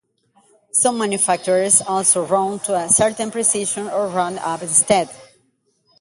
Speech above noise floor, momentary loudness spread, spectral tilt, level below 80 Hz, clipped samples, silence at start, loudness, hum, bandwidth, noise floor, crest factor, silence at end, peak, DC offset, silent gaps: 46 dB; 8 LU; -2.5 dB/octave; -58 dBFS; under 0.1%; 0.75 s; -17 LUFS; none; 12 kHz; -64 dBFS; 20 dB; 0.75 s; 0 dBFS; under 0.1%; none